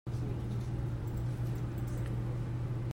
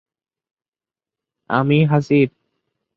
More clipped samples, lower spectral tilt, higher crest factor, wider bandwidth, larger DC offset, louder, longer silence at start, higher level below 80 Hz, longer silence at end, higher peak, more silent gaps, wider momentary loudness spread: neither; about the same, -8 dB/octave vs -8.5 dB/octave; second, 12 dB vs 18 dB; first, 16 kHz vs 7 kHz; neither; second, -37 LUFS vs -17 LUFS; second, 0.05 s vs 1.5 s; first, -44 dBFS vs -60 dBFS; second, 0 s vs 0.7 s; second, -24 dBFS vs -2 dBFS; neither; second, 1 LU vs 6 LU